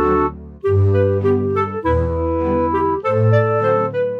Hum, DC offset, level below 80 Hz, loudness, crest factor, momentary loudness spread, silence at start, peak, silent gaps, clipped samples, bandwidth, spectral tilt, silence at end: none; under 0.1%; -34 dBFS; -17 LUFS; 14 dB; 5 LU; 0 s; -4 dBFS; none; under 0.1%; 5.2 kHz; -10 dB/octave; 0 s